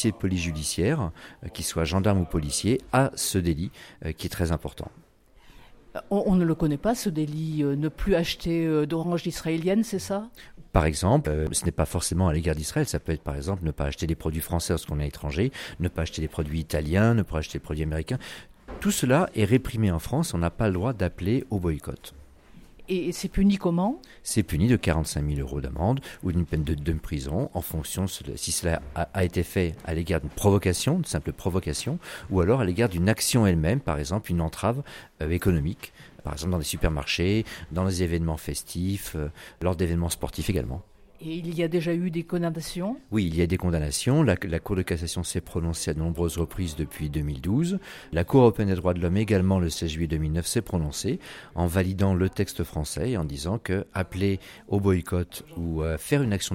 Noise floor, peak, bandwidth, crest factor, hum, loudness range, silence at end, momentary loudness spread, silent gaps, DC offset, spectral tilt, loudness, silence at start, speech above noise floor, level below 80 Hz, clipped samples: -54 dBFS; -6 dBFS; 16.5 kHz; 20 dB; none; 4 LU; 0 s; 9 LU; none; under 0.1%; -5.5 dB/octave; -27 LUFS; 0 s; 28 dB; -38 dBFS; under 0.1%